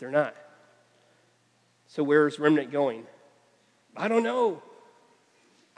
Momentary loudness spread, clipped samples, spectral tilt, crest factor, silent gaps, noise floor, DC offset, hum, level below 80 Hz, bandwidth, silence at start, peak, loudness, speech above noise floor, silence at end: 18 LU; under 0.1%; -6.5 dB/octave; 22 dB; none; -66 dBFS; under 0.1%; none; under -90 dBFS; 9.8 kHz; 0 s; -8 dBFS; -26 LUFS; 41 dB; 1.2 s